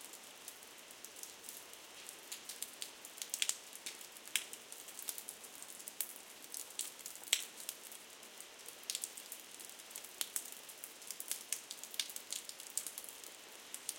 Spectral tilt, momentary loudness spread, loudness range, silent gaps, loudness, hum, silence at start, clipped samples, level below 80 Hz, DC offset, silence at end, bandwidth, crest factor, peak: 2 dB/octave; 13 LU; 3 LU; none; -44 LUFS; none; 0 s; under 0.1%; under -90 dBFS; under 0.1%; 0 s; 17 kHz; 36 dB; -10 dBFS